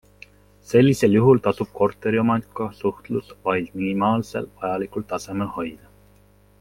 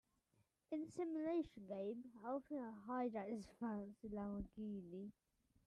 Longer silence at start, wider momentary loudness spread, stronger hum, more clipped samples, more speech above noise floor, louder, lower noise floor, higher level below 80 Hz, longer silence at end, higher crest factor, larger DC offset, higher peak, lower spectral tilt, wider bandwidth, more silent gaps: about the same, 0.7 s vs 0.7 s; first, 13 LU vs 7 LU; first, 50 Hz at -45 dBFS vs none; neither; about the same, 33 dB vs 35 dB; first, -22 LUFS vs -48 LUFS; second, -54 dBFS vs -83 dBFS; first, -54 dBFS vs -72 dBFS; first, 0.85 s vs 0.55 s; first, 20 dB vs 14 dB; neither; first, -2 dBFS vs -34 dBFS; about the same, -7 dB/octave vs -8 dB/octave; first, 16.5 kHz vs 11 kHz; neither